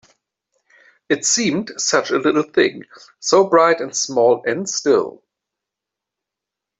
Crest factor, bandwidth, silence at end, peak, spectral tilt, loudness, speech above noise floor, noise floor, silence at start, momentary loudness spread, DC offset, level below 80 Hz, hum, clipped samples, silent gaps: 16 dB; 8.4 kHz; 1.7 s; -2 dBFS; -2.5 dB/octave; -17 LUFS; 67 dB; -85 dBFS; 1.1 s; 7 LU; under 0.1%; -66 dBFS; none; under 0.1%; none